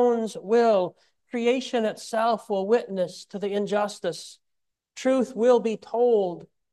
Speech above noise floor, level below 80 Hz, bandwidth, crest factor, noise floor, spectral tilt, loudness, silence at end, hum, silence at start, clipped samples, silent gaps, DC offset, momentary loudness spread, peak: 56 dB; -78 dBFS; 12 kHz; 16 dB; -81 dBFS; -5 dB/octave; -25 LUFS; 0.25 s; none; 0 s; under 0.1%; none; under 0.1%; 11 LU; -8 dBFS